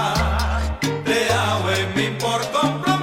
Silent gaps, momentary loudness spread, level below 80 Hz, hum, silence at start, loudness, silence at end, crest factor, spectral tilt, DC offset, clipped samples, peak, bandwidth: none; 4 LU; -30 dBFS; none; 0 s; -20 LUFS; 0 s; 14 dB; -4.5 dB/octave; under 0.1%; under 0.1%; -6 dBFS; 16.5 kHz